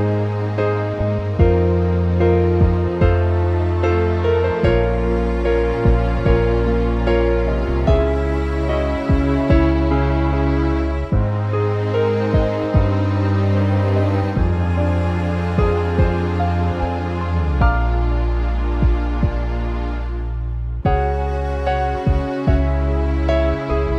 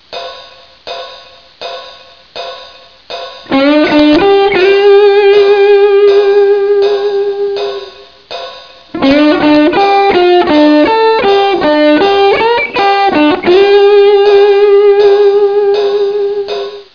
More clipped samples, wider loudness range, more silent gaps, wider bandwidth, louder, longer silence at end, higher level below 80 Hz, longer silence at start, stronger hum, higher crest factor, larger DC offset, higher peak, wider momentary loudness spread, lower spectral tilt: neither; about the same, 4 LU vs 6 LU; neither; first, 6.6 kHz vs 5.4 kHz; second, -19 LUFS vs -8 LUFS; second, 0 s vs 0.15 s; first, -22 dBFS vs -44 dBFS; about the same, 0 s vs 0.1 s; neither; first, 16 dB vs 8 dB; second, under 0.1% vs 0.3%; about the same, 0 dBFS vs 0 dBFS; second, 5 LU vs 18 LU; first, -9 dB/octave vs -5.5 dB/octave